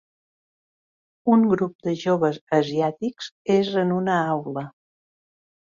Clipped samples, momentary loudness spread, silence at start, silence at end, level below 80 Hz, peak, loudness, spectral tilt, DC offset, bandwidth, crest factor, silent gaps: under 0.1%; 12 LU; 1.25 s; 1 s; -66 dBFS; -6 dBFS; -23 LUFS; -7 dB/octave; under 0.1%; 7.4 kHz; 18 dB; 1.75-1.79 s, 2.41-2.47 s, 3.32-3.45 s